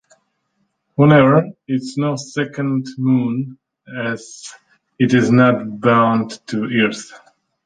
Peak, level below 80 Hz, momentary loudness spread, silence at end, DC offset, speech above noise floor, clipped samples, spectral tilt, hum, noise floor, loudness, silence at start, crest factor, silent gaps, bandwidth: -2 dBFS; -56 dBFS; 19 LU; 0.5 s; under 0.1%; 52 dB; under 0.1%; -7 dB/octave; none; -68 dBFS; -17 LUFS; 1 s; 16 dB; none; 9.4 kHz